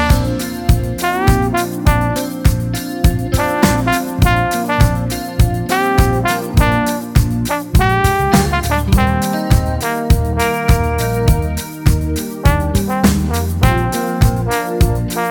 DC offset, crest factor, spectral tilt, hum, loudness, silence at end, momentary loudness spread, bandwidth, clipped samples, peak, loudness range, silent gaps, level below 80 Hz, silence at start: under 0.1%; 14 dB; -5.5 dB/octave; none; -15 LUFS; 0 s; 5 LU; 19.5 kHz; under 0.1%; 0 dBFS; 1 LU; none; -20 dBFS; 0 s